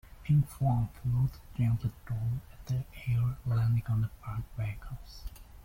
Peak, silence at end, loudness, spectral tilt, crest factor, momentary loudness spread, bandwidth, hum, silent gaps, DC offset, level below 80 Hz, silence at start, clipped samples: -18 dBFS; 0 s; -32 LUFS; -8.5 dB/octave; 14 dB; 14 LU; 16.5 kHz; none; none; under 0.1%; -46 dBFS; 0.05 s; under 0.1%